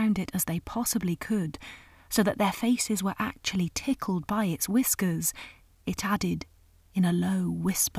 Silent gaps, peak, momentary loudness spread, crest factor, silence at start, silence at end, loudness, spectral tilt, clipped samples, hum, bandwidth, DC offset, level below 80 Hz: none; -10 dBFS; 10 LU; 18 dB; 0 s; 0 s; -28 LUFS; -4.5 dB/octave; under 0.1%; none; 16 kHz; under 0.1%; -54 dBFS